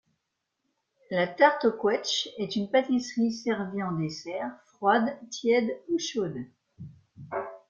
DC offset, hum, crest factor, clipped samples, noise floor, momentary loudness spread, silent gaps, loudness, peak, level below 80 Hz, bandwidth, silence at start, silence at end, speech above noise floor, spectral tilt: under 0.1%; none; 22 dB; under 0.1%; -82 dBFS; 15 LU; none; -28 LUFS; -6 dBFS; -72 dBFS; 7.6 kHz; 1.1 s; 0.1 s; 54 dB; -4.5 dB/octave